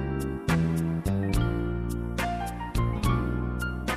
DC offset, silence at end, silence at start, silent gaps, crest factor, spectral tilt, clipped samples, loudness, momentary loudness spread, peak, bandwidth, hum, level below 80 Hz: under 0.1%; 0 s; 0 s; none; 16 dB; -6.5 dB/octave; under 0.1%; -29 LUFS; 5 LU; -12 dBFS; 15.5 kHz; none; -34 dBFS